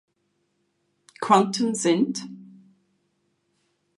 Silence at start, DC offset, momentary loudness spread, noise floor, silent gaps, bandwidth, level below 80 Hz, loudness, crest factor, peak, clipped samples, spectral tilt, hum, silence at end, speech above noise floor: 1.2 s; under 0.1%; 15 LU; -72 dBFS; none; 11.5 kHz; -78 dBFS; -22 LUFS; 24 dB; -4 dBFS; under 0.1%; -4.5 dB/octave; 50 Hz at -45 dBFS; 1.55 s; 51 dB